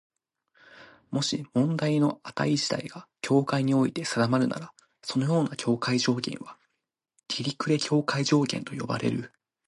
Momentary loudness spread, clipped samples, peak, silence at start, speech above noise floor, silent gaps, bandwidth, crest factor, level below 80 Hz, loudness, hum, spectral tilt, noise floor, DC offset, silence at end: 11 LU; under 0.1%; -10 dBFS; 0.75 s; 56 dB; none; 11.5 kHz; 18 dB; -68 dBFS; -27 LUFS; none; -5.5 dB/octave; -82 dBFS; under 0.1%; 0.4 s